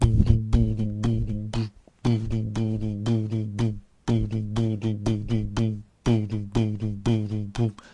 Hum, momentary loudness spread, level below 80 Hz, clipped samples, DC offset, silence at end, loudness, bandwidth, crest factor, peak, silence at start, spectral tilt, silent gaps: none; 6 LU; -34 dBFS; under 0.1%; under 0.1%; 0.05 s; -26 LUFS; 10 kHz; 20 dB; -6 dBFS; 0 s; -8 dB/octave; none